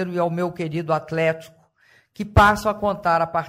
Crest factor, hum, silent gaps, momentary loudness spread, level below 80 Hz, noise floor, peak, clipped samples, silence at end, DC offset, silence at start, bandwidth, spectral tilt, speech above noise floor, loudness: 16 dB; none; none; 11 LU; -36 dBFS; -58 dBFS; -6 dBFS; under 0.1%; 0 s; under 0.1%; 0 s; 16 kHz; -6.5 dB/octave; 37 dB; -21 LUFS